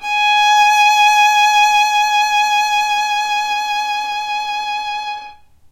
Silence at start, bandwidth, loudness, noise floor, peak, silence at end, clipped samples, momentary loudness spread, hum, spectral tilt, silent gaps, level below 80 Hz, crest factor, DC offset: 0 s; 16 kHz; -13 LUFS; -38 dBFS; -2 dBFS; 0.4 s; under 0.1%; 11 LU; none; 3.5 dB/octave; none; -56 dBFS; 12 dB; under 0.1%